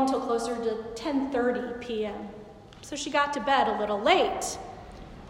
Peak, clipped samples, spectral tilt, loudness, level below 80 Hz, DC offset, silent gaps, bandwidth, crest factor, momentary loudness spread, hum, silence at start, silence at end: -10 dBFS; under 0.1%; -3.5 dB/octave; -27 LUFS; -54 dBFS; under 0.1%; none; 16 kHz; 18 dB; 20 LU; none; 0 s; 0 s